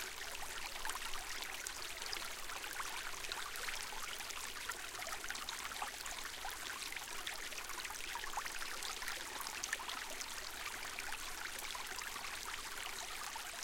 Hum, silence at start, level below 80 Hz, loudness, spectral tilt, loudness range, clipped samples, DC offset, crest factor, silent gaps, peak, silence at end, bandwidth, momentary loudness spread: none; 0 s; -58 dBFS; -43 LUFS; 0.5 dB/octave; 1 LU; under 0.1%; under 0.1%; 24 dB; none; -20 dBFS; 0 s; 17 kHz; 2 LU